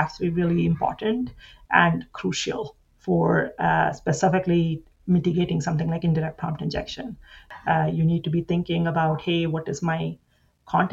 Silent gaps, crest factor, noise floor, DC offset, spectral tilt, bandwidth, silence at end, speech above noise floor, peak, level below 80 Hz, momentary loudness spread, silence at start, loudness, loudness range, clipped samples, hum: none; 22 dB; -43 dBFS; under 0.1%; -6.5 dB/octave; 8 kHz; 0 s; 20 dB; -2 dBFS; -48 dBFS; 12 LU; 0 s; -24 LUFS; 3 LU; under 0.1%; none